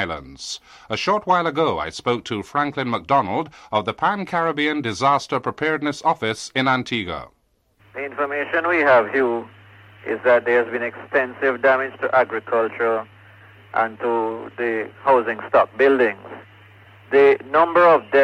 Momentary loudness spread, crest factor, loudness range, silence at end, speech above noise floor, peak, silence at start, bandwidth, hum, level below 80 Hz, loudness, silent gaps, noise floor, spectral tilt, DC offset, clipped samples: 13 LU; 16 dB; 3 LU; 0 s; 40 dB; -6 dBFS; 0 s; 11 kHz; none; -58 dBFS; -20 LUFS; none; -60 dBFS; -5 dB/octave; under 0.1%; under 0.1%